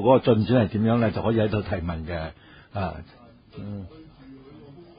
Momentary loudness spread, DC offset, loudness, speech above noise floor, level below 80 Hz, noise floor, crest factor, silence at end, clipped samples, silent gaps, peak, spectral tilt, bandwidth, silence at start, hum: 20 LU; under 0.1%; -24 LUFS; 23 dB; -44 dBFS; -46 dBFS; 20 dB; 0.15 s; under 0.1%; none; -6 dBFS; -12 dB/octave; 5.2 kHz; 0 s; none